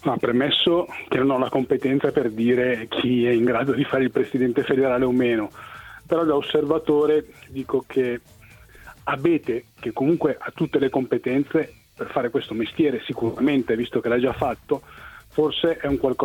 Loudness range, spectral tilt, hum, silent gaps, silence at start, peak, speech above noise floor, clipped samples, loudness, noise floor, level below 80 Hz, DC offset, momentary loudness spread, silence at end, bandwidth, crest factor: 4 LU; -7 dB/octave; none; none; 0.05 s; -8 dBFS; 26 dB; under 0.1%; -22 LUFS; -47 dBFS; -52 dBFS; under 0.1%; 9 LU; 0 s; 17 kHz; 14 dB